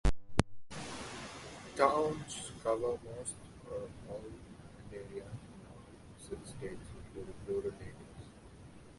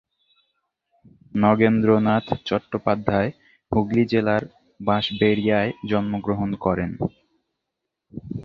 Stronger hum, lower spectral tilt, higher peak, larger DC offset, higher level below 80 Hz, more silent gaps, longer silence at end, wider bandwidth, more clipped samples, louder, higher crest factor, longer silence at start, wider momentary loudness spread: neither; second, -5 dB/octave vs -8.5 dB/octave; second, -8 dBFS vs -2 dBFS; neither; about the same, -48 dBFS vs -50 dBFS; neither; about the same, 0 s vs 0 s; first, 11.5 kHz vs 6.2 kHz; neither; second, -39 LUFS vs -22 LUFS; first, 30 dB vs 22 dB; second, 0.05 s vs 1.35 s; first, 20 LU vs 12 LU